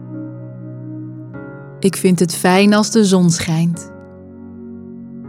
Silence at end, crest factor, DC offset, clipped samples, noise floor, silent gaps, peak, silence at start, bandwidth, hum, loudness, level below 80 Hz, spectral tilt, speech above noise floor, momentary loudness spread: 0 s; 16 dB; under 0.1%; under 0.1%; -36 dBFS; none; -2 dBFS; 0 s; 16 kHz; none; -14 LUFS; -56 dBFS; -5.5 dB/octave; 23 dB; 22 LU